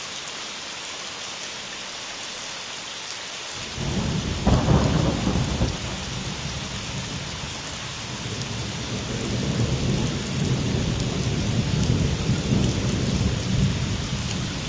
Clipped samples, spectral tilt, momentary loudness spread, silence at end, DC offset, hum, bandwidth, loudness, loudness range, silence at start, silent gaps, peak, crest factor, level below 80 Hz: under 0.1%; -5 dB/octave; 9 LU; 0 s; under 0.1%; none; 8 kHz; -26 LUFS; 6 LU; 0 s; none; -4 dBFS; 20 dB; -34 dBFS